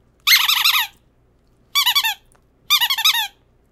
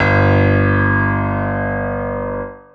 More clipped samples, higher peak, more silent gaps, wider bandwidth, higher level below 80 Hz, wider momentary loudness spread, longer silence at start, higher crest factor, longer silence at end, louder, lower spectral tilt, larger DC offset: neither; about the same, 0 dBFS vs -2 dBFS; neither; first, 17.5 kHz vs 5 kHz; second, -60 dBFS vs -34 dBFS; about the same, 12 LU vs 10 LU; first, 0.25 s vs 0 s; first, 20 dB vs 14 dB; first, 0.45 s vs 0.15 s; about the same, -15 LUFS vs -16 LUFS; second, 4.5 dB/octave vs -9.5 dB/octave; neither